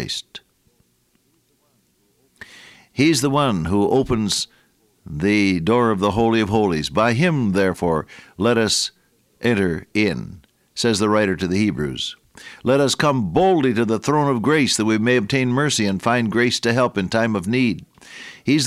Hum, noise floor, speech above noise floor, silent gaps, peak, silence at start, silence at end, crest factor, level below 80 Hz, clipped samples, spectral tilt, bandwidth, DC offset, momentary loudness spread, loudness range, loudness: none; -63 dBFS; 44 dB; none; -4 dBFS; 0 s; 0 s; 16 dB; -48 dBFS; under 0.1%; -5 dB/octave; 15 kHz; under 0.1%; 11 LU; 4 LU; -19 LUFS